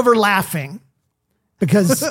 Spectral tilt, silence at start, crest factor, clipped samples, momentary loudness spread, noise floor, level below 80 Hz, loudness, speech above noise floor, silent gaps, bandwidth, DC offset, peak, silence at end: -5 dB/octave; 0 s; 16 dB; under 0.1%; 12 LU; -70 dBFS; -58 dBFS; -17 LUFS; 54 dB; none; 17 kHz; under 0.1%; -2 dBFS; 0 s